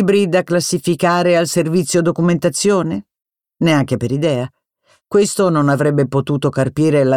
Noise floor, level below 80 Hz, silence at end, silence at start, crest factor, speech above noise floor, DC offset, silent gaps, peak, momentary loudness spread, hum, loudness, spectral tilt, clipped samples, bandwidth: -58 dBFS; -54 dBFS; 0 s; 0 s; 14 dB; 44 dB; under 0.1%; none; -2 dBFS; 5 LU; none; -16 LUFS; -5.5 dB/octave; under 0.1%; 16 kHz